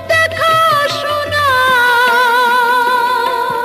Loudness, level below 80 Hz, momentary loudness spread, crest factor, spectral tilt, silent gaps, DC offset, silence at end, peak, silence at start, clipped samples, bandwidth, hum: -11 LUFS; -50 dBFS; 5 LU; 10 dB; -2.5 dB/octave; none; under 0.1%; 0 s; -2 dBFS; 0 s; under 0.1%; 14.5 kHz; none